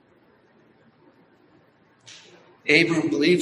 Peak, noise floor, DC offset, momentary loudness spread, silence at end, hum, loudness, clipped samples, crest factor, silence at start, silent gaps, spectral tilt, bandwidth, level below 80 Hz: -4 dBFS; -59 dBFS; under 0.1%; 27 LU; 0 s; none; -20 LUFS; under 0.1%; 22 dB; 2.65 s; none; -5 dB/octave; 12 kHz; -70 dBFS